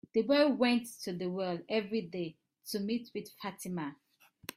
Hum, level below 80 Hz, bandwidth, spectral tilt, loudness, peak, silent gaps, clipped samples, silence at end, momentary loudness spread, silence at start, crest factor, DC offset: none; -76 dBFS; 16 kHz; -5 dB/octave; -34 LUFS; -16 dBFS; none; under 0.1%; 0.05 s; 16 LU; 0.15 s; 18 dB; under 0.1%